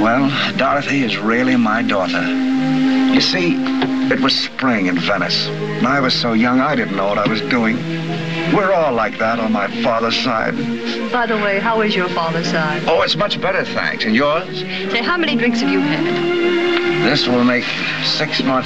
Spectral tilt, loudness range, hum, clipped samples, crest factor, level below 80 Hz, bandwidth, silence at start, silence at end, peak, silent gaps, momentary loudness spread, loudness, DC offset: -5 dB/octave; 2 LU; none; under 0.1%; 14 dB; -50 dBFS; 8.2 kHz; 0 s; 0 s; -2 dBFS; none; 4 LU; -16 LUFS; 1%